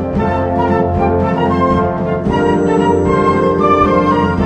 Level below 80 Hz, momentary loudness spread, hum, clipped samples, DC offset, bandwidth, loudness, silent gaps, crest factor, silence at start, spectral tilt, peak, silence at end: -30 dBFS; 4 LU; none; under 0.1%; under 0.1%; 9 kHz; -13 LUFS; none; 12 dB; 0 s; -8 dB/octave; 0 dBFS; 0 s